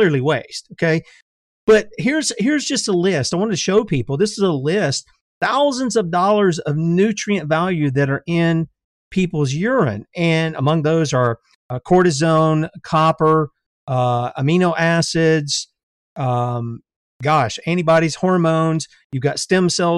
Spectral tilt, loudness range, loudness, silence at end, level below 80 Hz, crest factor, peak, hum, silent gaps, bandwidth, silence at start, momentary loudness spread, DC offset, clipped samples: -5.5 dB/octave; 2 LU; -18 LUFS; 0 s; -52 dBFS; 16 dB; -2 dBFS; none; 1.22-1.67 s, 5.21-5.41 s, 8.84-9.11 s, 11.55-11.69 s, 13.66-13.87 s, 15.83-16.16 s, 16.96-17.20 s, 19.04-19.10 s; 11.5 kHz; 0 s; 8 LU; under 0.1%; under 0.1%